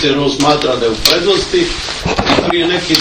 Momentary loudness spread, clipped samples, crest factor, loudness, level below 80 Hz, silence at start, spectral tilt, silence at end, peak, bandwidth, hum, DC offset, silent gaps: 5 LU; 0.3%; 12 dB; -12 LUFS; -32 dBFS; 0 s; -3.5 dB/octave; 0 s; 0 dBFS; over 20 kHz; none; under 0.1%; none